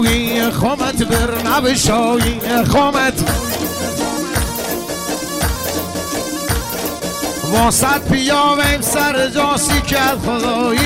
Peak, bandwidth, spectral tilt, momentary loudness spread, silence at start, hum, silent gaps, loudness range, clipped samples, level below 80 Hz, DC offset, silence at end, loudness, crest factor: -4 dBFS; 16.5 kHz; -3.5 dB/octave; 8 LU; 0 s; none; none; 6 LU; under 0.1%; -28 dBFS; under 0.1%; 0 s; -16 LUFS; 12 dB